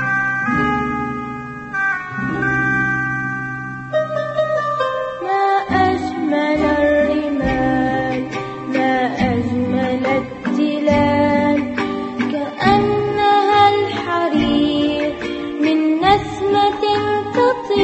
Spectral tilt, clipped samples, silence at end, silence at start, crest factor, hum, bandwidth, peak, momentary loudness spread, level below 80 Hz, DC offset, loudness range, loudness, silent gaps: -6.5 dB/octave; under 0.1%; 0 s; 0 s; 16 dB; none; 8.4 kHz; 0 dBFS; 8 LU; -40 dBFS; under 0.1%; 3 LU; -18 LUFS; none